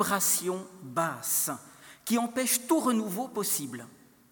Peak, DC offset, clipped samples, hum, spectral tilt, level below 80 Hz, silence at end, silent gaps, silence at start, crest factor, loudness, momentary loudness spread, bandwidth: -10 dBFS; under 0.1%; under 0.1%; none; -3 dB/octave; -76 dBFS; 0.4 s; none; 0 s; 20 dB; -28 LUFS; 14 LU; 19 kHz